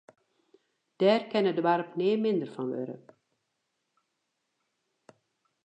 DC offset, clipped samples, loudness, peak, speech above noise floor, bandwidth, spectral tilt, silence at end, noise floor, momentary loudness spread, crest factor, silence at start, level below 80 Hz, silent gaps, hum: under 0.1%; under 0.1%; -28 LUFS; -12 dBFS; 53 dB; 8.6 kHz; -7.5 dB/octave; 2.7 s; -81 dBFS; 11 LU; 20 dB; 1 s; -88 dBFS; none; none